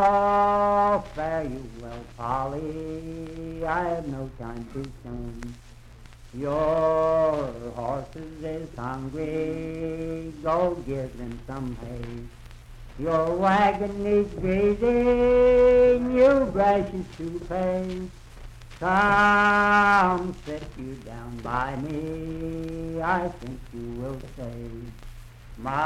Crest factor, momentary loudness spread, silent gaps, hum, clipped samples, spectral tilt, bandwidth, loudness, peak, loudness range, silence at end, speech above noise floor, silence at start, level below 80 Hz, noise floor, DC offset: 16 dB; 19 LU; none; none; under 0.1%; -7 dB/octave; 12 kHz; -24 LUFS; -8 dBFS; 11 LU; 0 s; 22 dB; 0 s; -42 dBFS; -46 dBFS; under 0.1%